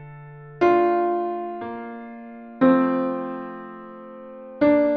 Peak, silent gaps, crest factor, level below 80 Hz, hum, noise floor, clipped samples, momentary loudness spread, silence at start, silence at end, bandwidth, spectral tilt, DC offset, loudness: -4 dBFS; none; 18 dB; -62 dBFS; none; -41 dBFS; under 0.1%; 22 LU; 0 s; 0 s; 6.2 kHz; -8.5 dB/octave; under 0.1%; -22 LUFS